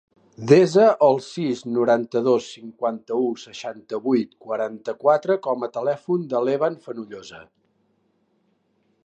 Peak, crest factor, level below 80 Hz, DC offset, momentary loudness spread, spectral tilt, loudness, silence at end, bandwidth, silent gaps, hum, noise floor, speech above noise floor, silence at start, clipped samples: -2 dBFS; 20 dB; -72 dBFS; under 0.1%; 18 LU; -6.5 dB/octave; -21 LUFS; 1.65 s; 9 kHz; none; none; -67 dBFS; 46 dB; 0.4 s; under 0.1%